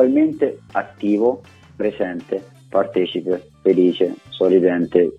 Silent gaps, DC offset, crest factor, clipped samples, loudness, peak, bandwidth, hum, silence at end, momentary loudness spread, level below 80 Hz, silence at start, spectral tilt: none; under 0.1%; 18 dB; under 0.1%; -19 LUFS; -2 dBFS; 6 kHz; none; 0.05 s; 10 LU; -60 dBFS; 0 s; -8 dB/octave